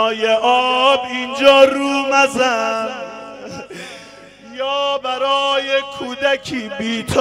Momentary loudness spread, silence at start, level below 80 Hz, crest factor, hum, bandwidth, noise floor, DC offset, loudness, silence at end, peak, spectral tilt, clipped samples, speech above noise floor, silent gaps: 20 LU; 0 s; -54 dBFS; 18 dB; 50 Hz at -55 dBFS; 13 kHz; -40 dBFS; under 0.1%; -16 LUFS; 0 s; 0 dBFS; -3 dB/octave; under 0.1%; 24 dB; none